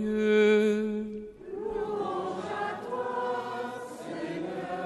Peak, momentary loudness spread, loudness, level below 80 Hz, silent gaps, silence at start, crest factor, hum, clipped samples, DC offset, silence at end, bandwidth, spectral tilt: -12 dBFS; 15 LU; -30 LUFS; -62 dBFS; none; 0 s; 16 dB; none; under 0.1%; under 0.1%; 0 s; 12 kHz; -6 dB/octave